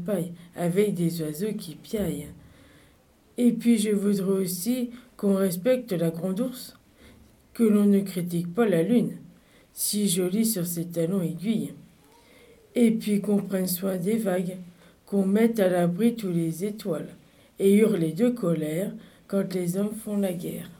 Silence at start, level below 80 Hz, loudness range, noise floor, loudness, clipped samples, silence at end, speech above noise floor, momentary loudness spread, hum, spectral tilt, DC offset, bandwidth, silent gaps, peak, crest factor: 0 s; -62 dBFS; 3 LU; -59 dBFS; -26 LUFS; under 0.1%; 0.05 s; 34 dB; 12 LU; none; -6 dB/octave; under 0.1%; 19 kHz; none; -8 dBFS; 18 dB